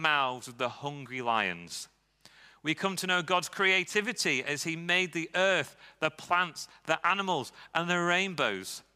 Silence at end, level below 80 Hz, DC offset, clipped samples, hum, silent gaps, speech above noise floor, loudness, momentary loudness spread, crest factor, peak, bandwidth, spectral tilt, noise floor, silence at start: 0.15 s; -76 dBFS; under 0.1%; under 0.1%; none; none; 29 dB; -29 LUFS; 11 LU; 22 dB; -8 dBFS; 16 kHz; -3 dB/octave; -59 dBFS; 0 s